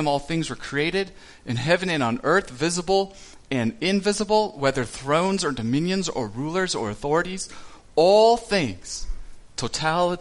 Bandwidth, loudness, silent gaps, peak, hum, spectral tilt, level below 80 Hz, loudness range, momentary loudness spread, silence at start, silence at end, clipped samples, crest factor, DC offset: 11.5 kHz; -23 LUFS; none; -6 dBFS; none; -4.5 dB/octave; -44 dBFS; 2 LU; 12 LU; 0 s; 0 s; under 0.1%; 18 dB; under 0.1%